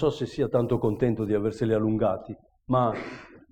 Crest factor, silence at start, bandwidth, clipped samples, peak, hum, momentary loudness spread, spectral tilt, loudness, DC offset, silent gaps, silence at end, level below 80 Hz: 14 dB; 0 s; 9.2 kHz; under 0.1%; -12 dBFS; none; 15 LU; -8.5 dB/octave; -26 LUFS; under 0.1%; none; 0.15 s; -50 dBFS